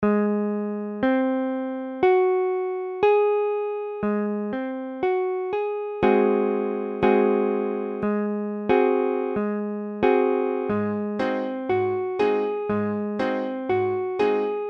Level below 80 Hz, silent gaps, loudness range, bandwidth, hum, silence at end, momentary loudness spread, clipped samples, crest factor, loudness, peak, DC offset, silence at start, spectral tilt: -58 dBFS; none; 2 LU; 5.8 kHz; none; 0 s; 8 LU; under 0.1%; 16 dB; -24 LUFS; -6 dBFS; under 0.1%; 0 s; -8.5 dB/octave